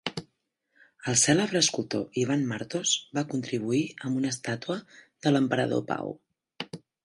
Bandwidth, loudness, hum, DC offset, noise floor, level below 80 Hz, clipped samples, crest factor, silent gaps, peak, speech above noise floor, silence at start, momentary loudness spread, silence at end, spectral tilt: 11.5 kHz; -27 LUFS; none; under 0.1%; -76 dBFS; -68 dBFS; under 0.1%; 20 dB; none; -8 dBFS; 49 dB; 0.05 s; 16 LU; 0.3 s; -3.5 dB/octave